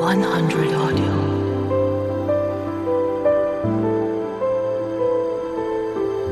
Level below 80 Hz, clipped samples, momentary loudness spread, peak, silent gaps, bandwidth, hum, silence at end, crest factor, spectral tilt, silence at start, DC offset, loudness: -50 dBFS; under 0.1%; 5 LU; -6 dBFS; none; 13 kHz; none; 0 s; 14 dB; -7.5 dB/octave; 0 s; under 0.1%; -21 LUFS